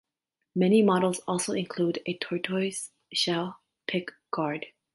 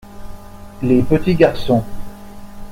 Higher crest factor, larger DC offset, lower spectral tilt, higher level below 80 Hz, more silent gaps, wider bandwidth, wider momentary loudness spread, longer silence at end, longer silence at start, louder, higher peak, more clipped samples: about the same, 18 dB vs 16 dB; neither; second, -4.5 dB/octave vs -8 dB/octave; second, -74 dBFS vs -34 dBFS; neither; second, 11.5 kHz vs 16.5 kHz; second, 14 LU vs 24 LU; first, 0.25 s vs 0 s; first, 0.55 s vs 0.05 s; second, -28 LUFS vs -16 LUFS; second, -10 dBFS vs 0 dBFS; neither